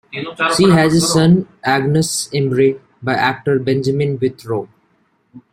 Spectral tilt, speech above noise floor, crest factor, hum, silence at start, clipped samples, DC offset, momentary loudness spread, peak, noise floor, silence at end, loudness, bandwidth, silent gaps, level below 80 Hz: -5 dB/octave; 45 dB; 14 dB; none; 0.15 s; under 0.1%; under 0.1%; 12 LU; -2 dBFS; -60 dBFS; 0.15 s; -15 LUFS; 14.5 kHz; none; -50 dBFS